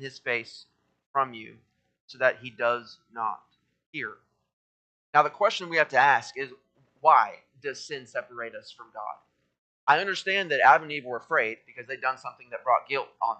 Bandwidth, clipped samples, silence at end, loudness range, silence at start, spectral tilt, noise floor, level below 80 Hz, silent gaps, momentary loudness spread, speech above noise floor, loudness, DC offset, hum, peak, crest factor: 8.8 kHz; under 0.1%; 0.05 s; 7 LU; 0 s; -3.5 dB/octave; under -90 dBFS; -84 dBFS; 1.06-1.14 s, 2.00-2.08 s, 3.86-3.93 s, 4.53-5.13 s, 9.58-9.87 s; 18 LU; over 63 dB; -26 LUFS; under 0.1%; none; -4 dBFS; 24 dB